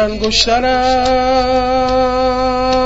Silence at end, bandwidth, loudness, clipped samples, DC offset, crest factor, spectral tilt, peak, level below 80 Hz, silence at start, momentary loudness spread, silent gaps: 0 s; 8 kHz; -13 LUFS; under 0.1%; 1%; 14 dB; -3.5 dB/octave; 0 dBFS; -30 dBFS; 0 s; 2 LU; none